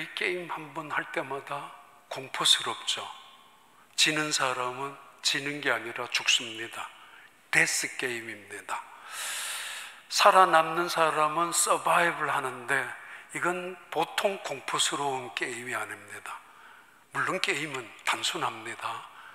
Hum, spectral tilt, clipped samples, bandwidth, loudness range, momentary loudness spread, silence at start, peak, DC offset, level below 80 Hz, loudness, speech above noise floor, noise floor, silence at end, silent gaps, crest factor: none; -1.5 dB/octave; under 0.1%; 16 kHz; 8 LU; 16 LU; 0 s; -4 dBFS; under 0.1%; -82 dBFS; -28 LUFS; 29 dB; -58 dBFS; 0 s; none; 26 dB